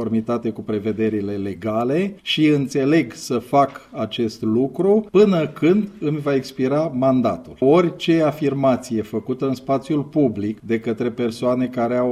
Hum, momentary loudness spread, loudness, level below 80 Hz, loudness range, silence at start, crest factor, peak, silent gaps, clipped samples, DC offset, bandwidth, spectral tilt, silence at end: none; 8 LU; -20 LUFS; -56 dBFS; 3 LU; 0 s; 16 dB; -4 dBFS; none; under 0.1%; under 0.1%; 14.5 kHz; -7 dB/octave; 0 s